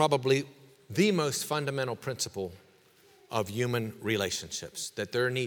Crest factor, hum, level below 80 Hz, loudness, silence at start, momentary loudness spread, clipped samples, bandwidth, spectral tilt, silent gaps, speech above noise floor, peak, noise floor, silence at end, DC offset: 22 dB; none; -68 dBFS; -31 LUFS; 0 s; 11 LU; under 0.1%; over 20 kHz; -4 dB/octave; none; 31 dB; -10 dBFS; -61 dBFS; 0 s; under 0.1%